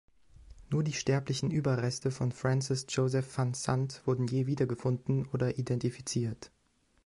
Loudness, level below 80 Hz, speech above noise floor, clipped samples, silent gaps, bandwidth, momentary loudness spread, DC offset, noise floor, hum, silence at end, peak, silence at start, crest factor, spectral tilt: -32 LUFS; -60 dBFS; 40 dB; under 0.1%; none; 11.5 kHz; 3 LU; under 0.1%; -71 dBFS; none; 0.6 s; -14 dBFS; 0.4 s; 18 dB; -6 dB/octave